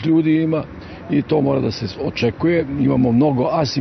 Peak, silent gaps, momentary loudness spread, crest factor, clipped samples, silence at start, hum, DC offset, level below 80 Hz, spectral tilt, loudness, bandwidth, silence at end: -4 dBFS; none; 9 LU; 12 dB; under 0.1%; 0 s; none; under 0.1%; -46 dBFS; -7.5 dB/octave; -18 LUFS; 6.2 kHz; 0 s